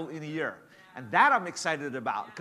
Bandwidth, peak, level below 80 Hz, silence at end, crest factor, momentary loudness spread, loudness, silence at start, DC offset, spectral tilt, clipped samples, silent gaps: 14 kHz; -8 dBFS; -82 dBFS; 0 s; 22 dB; 15 LU; -28 LUFS; 0 s; under 0.1%; -3.5 dB/octave; under 0.1%; none